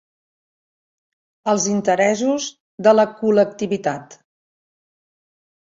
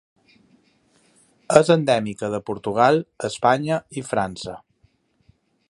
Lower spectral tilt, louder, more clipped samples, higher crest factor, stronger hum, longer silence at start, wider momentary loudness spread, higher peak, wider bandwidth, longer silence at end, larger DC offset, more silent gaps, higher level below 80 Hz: about the same, -4.5 dB/octave vs -5.5 dB/octave; first, -18 LUFS vs -21 LUFS; neither; about the same, 20 dB vs 22 dB; neither; about the same, 1.45 s vs 1.5 s; about the same, 11 LU vs 12 LU; about the same, -2 dBFS vs 0 dBFS; second, 7.8 kHz vs 11.5 kHz; first, 1.6 s vs 1.15 s; neither; first, 2.60-2.78 s vs none; second, -66 dBFS vs -58 dBFS